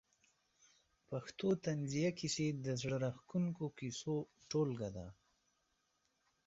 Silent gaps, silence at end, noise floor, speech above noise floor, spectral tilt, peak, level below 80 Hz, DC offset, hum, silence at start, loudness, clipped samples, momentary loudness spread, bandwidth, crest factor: none; 1.35 s; -82 dBFS; 42 dB; -6.5 dB/octave; -26 dBFS; -70 dBFS; under 0.1%; none; 1.1 s; -40 LUFS; under 0.1%; 9 LU; 8 kHz; 16 dB